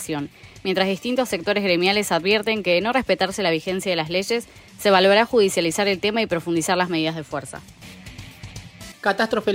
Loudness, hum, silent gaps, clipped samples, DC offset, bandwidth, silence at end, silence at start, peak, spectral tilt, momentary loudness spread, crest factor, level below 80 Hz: -21 LUFS; none; none; under 0.1%; under 0.1%; 16 kHz; 0 s; 0 s; -4 dBFS; -4 dB/octave; 21 LU; 18 dB; -54 dBFS